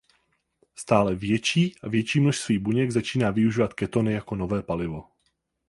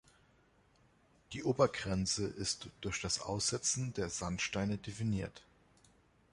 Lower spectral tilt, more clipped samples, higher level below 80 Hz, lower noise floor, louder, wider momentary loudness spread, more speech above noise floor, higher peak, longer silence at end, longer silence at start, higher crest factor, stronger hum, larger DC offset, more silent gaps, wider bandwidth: first, -6 dB/octave vs -3.5 dB/octave; neither; first, -52 dBFS vs -58 dBFS; first, -73 dBFS vs -69 dBFS; first, -25 LUFS vs -36 LUFS; about the same, 7 LU vs 8 LU; first, 50 dB vs 33 dB; first, -4 dBFS vs -14 dBFS; second, 0.65 s vs 0.9 s; second, 0.8 s vs 1.3 s; about the same, 20 dB vs 24 dB; neither; neither; neither; about the same, 11.5 kHz vs 11.5 kHz